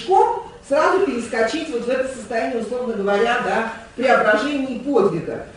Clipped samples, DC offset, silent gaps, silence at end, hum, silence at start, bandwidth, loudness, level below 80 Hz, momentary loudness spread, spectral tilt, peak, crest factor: under 0.1%; under 0.1%; none; 0 s; none; 0 s; 10.5 kHz; -20 LUFS; -52 dBFS; 8 LU; -5 dB/octave; -2 dBFS; 18 dB